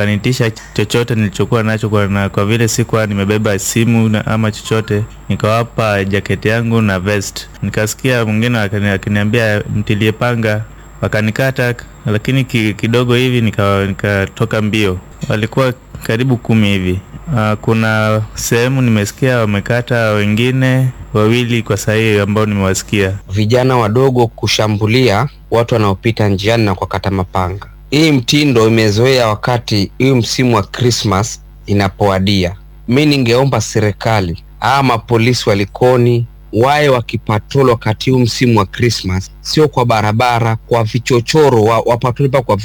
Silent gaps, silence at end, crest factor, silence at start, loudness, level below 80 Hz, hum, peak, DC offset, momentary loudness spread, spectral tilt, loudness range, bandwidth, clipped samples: none; 0 s; 12 dB; 0 s; -13 LUFS; -38 dBFS; none; 0 dBFS; under 0.1%; 6 LU; -5.5 dB/octave; 3 LU; 18.5 kHz; under 0.1%